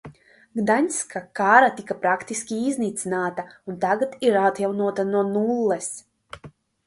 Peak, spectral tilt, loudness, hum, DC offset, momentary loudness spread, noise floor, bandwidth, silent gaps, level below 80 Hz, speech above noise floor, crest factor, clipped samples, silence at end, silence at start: 0 dBFS; -4.5 dB/octave; -22 LUFS; none; under 0.1%; 17 LU; -47 dBFS; 11.5 kHz; none; -64 dBFS; 25 dB; 22 dB; under 0.1%; 0.4 s; 0.05 s